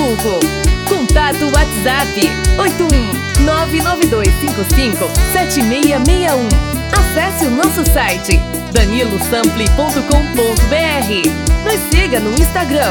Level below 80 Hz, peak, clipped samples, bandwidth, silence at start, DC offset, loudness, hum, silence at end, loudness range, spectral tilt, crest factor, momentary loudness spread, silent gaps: -16 dBFS; 0 dBFS; under 0.1%; over 20 kHz; 0 s; under 0.1%; -13 LUFS; none; 0 s; 1 LU; -4.5 dB/octave; 12 dB; 2 LU; none